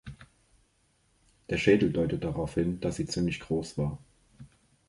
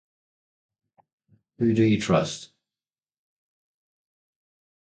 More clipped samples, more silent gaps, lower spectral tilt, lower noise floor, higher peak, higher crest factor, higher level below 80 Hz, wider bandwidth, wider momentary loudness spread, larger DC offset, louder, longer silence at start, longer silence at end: neither; neither; about the same, -6.5 dB/octave vs -6 dB/octave; second, -69 dBFS vs under -90 dBFS; about the same, -8 dBFS vs -6 dBFS; about the same, 22 dB vs 22 dB; first, -50 dBFS vs -60 dBFS; first, 11.5 kHz vs 9.2 kHz; about the same, 10 LU vs 11 LU; neither; second, -29 LUFS vs -23 LUFS; second, 0.05 s vs 1.6 s; second, 0.4 s vs 2.35 s